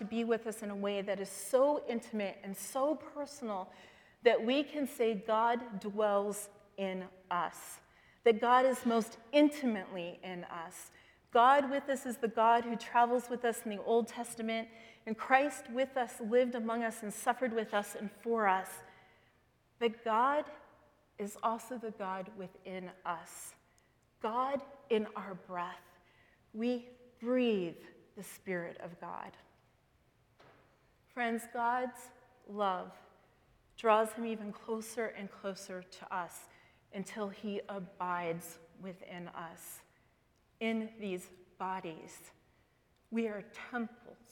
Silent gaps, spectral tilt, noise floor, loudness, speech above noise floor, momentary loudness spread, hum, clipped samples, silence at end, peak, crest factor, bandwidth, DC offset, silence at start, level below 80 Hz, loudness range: none; -4.5 dB/octave; -72 dBFS; -35 LUFS; 37 dB; 18 LU; none; under 0.1%; 0.15 s; -12 dBFS; 24 dB; 19 kHz; under 0.1%; 0 s; -78 dBFS; 10 LU